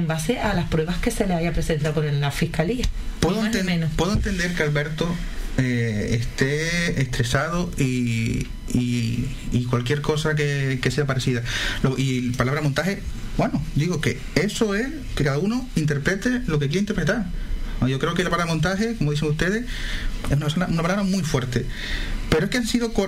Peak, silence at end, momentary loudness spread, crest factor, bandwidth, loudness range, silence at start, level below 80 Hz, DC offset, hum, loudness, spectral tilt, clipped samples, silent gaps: -4 dBFS; 0 s; 5 LU; 18 dB; 16 kHz; 1 LU; 0 s; -32 dBFS; 0.3%; none; -23 LUFS; -5.5 dB/octave; under 0.1%; none